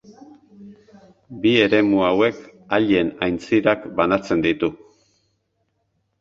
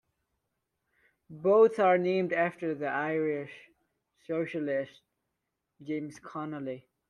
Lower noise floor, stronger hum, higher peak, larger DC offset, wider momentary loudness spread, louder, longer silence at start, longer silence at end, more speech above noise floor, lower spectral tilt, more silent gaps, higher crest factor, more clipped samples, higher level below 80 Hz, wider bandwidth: second, -71 dBFS vs -84 dBFS; neither; first, -2 dBFS vs -12 dBFS; neither; second, 8 LU vs 17 LU; first, -19 LUFS vs -29 LUFS; second, 0.1 s vs 1.3 s; first, 1.45 s vs 0.3 s; about the same, 52 dB vs 55 dB; about the same, -6.5 dB/octave vs -7.5 dB/octave; neither; about the same, 20 dB vs 20 dB; neither; first, -52 dBFS vs -78 dBFS; second, 7.4 kHz vs 10.5 kHz